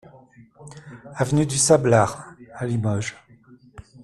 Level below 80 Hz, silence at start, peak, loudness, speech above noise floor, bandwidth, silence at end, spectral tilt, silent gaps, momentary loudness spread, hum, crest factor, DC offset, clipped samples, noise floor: -52 dBFS; 0.6 s; -2 dBFS; -21 LUFS; 31 dB; 13 kHz; 0.25 s; -5 dB/octave; none; 25 LU; none; 22 dB; under 0.1%; under 0.1%; -51 dBFS